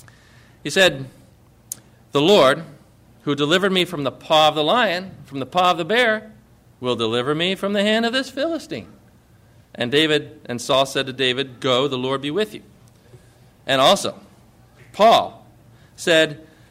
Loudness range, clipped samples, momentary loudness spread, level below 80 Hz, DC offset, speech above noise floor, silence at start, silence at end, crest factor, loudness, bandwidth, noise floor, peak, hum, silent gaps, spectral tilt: 4 LU; under 0.1%; 18 LU; -58 dBFS; under 0.1%; 33 dB; 0.65 s; 0.35 s; 16 dB; -19 LUFS; 16 kHz; -51 dBFS; -4 dBFS; none; none; -4 dB/octave